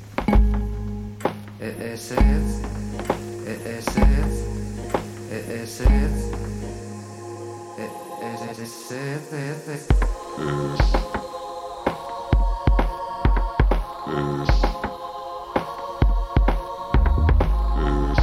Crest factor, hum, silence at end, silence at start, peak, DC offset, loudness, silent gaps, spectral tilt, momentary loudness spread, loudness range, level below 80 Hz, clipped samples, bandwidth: 20 dB; none; 0 s; 0 s; -2 dBFS; under 0.1%; -25 LUFS; none; -6.5 dB/octave; 13 LU; 5 LU; -24 dBFS; under 0.1%; 13.5 kHz